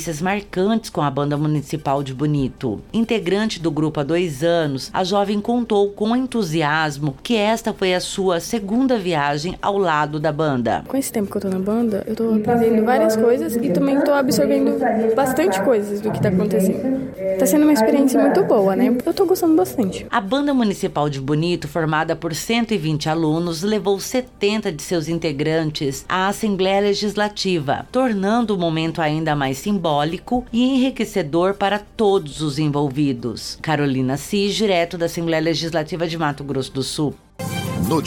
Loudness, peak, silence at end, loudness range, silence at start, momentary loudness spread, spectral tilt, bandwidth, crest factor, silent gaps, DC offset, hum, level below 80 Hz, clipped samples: -19 LUFS; -6 dBFS; 0 s; 4 LU; 0 s; 7 LU; -5.5 dB/octave; 18 kHz; 14 dB; none; under 0.1%; none; -46 dBFS; under 0.1%